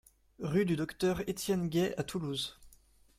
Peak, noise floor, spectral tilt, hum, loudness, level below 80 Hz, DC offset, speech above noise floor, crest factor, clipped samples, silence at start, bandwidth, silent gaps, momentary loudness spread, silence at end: -18 dBFS; -63 dBFS; -5.5 dB/octave; none; -34 LUFS; -60 dBFS; under 0.1%; 30 dB; 16 dB; under 0.1%; 0.4 s; 16 kHz; none; 7 LU; 0.5 s